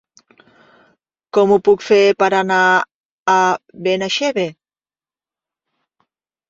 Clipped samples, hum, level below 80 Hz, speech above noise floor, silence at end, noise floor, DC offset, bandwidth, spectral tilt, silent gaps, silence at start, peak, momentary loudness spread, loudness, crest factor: under 0.1%; none; -62 dBFS; over 76 dB; 1.95 s; under -90 dBFS; under 0.1%; 7.8 kHz; -4 dB/octave; 2.95-3.26 s; 1.35 s; -2 dBFS; 9 LU; -15 LUFS; 16 dB